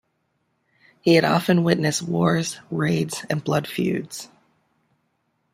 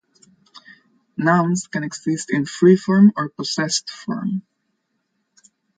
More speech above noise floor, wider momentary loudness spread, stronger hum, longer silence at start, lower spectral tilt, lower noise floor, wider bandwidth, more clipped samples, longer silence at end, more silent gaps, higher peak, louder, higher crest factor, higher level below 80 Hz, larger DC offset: second, 50 dB vs 54 dB; about the same, 11 LU vs 12 LU; neither; second, 1.05 s vs 1.2 s; about the same, -5.5 dB/octave vs -5.5 dB/octave; about the same, -71 dBFS vs -72 dBFS; first, 16 kHz vs 9.4 kHz; neither; second, 1.25 s vs 1.4 s; neither; about the same, -2 dBFS vs -2 dBFS; second, -22 LUFS vs -19 LUFS; about the same, 22 dB vs 18 dB; first, -62 dBFS vs -68 dBFS; neither